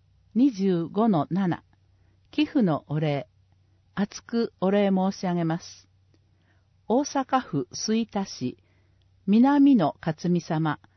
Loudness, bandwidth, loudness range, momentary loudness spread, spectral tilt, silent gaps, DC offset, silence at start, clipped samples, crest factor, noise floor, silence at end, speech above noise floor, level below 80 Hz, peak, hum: -25 LUFS; 6.4 kHz; 5 LU; 12 LU; -6.5 dB/octave; none; under 0.1%; 0.35 s; under 0.1%; 16 dB; -63 dBFS; 0.2 s; 39 dB; -66 dBFS; -10 dBFS; none